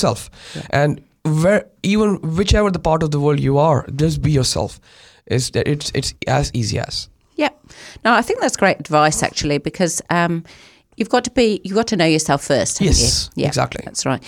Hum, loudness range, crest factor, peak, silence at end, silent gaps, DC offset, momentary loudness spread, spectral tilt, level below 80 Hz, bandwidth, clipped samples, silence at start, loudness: none; 3 LU; 16 dB; -2 dBFS; 0 s; none; under 0.1%; 7 LU; -4.5 dB/octave; -32 dBFS; 16.5 kHz; under 0.1%; 0 s; -18 LUFS